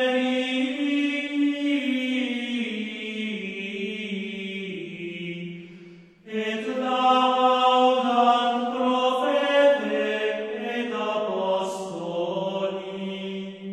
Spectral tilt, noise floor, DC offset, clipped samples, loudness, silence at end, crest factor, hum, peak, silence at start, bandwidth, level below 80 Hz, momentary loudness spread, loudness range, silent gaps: -5 dB/octave; -47 dBFS; under 0.1%; under 0.1%; -25 LUFS; 0 s; 18 dB; none; -8 dBFS; 0 s; 11 kHz; -74 dBFS; 13 LU; 11 LU; none